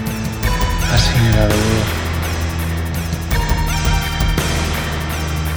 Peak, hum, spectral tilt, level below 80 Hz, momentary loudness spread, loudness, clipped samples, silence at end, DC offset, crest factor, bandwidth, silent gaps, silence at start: 0 dBFS; none; -5 dB/octave; -22 dBFS; 7 LU; -18 LUFS; under 0.1%; 0 s; under 0.1%; 16 dB; over 20 kHz; none; 0 s